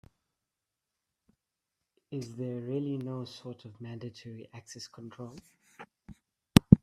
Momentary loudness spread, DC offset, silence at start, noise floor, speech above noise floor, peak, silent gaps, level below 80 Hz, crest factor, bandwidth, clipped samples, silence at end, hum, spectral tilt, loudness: 24 LU; under 0.1%; 2.1 s; -88 dBFS; 48 dB; 0 dBFS; none; -52 dBFS; 32 dB; 15 kHz; under 0.1%; 0.05 s; none; -6.5 dB/octave; -32 LUFS